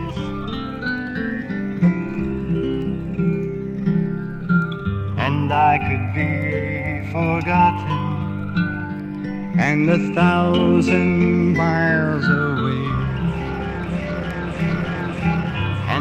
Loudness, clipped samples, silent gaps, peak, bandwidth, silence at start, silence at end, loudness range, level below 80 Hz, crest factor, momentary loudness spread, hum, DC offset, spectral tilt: -20 LUFS; under 0.1%; none; -4 dBFS; 8.4 kHz; 0 s; 0 s; 5 LU; -38 dBFS; 16 dB; 9 LU; none; under 0.1%; -8 dB/octave